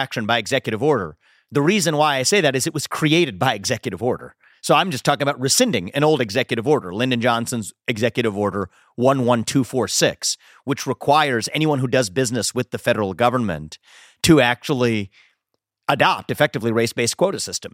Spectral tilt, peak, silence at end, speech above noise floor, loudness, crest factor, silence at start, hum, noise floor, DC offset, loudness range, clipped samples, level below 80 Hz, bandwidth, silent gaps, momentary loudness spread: -4 dB/octave; 0 dBFS; 0.05 s; 57 dB; -19 LUFS; 20 dB; 0 s; none; -76 dBFS; under 0.1%; 2 LU; under 0.1%; -54 dBFS; 16.5 kHz; none; 9 LU